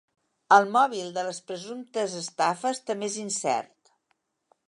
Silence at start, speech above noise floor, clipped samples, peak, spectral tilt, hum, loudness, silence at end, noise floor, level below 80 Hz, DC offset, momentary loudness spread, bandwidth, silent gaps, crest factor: 0.5 s; 49 dB; under 0.1%; -4 dBFS; -3 dB/octave; none; -26 LUFS; 1.05 s; -75 dBFS; -84 dBFS; under 0.1%; 14 LU; 11.5 kHz; none; 24 dB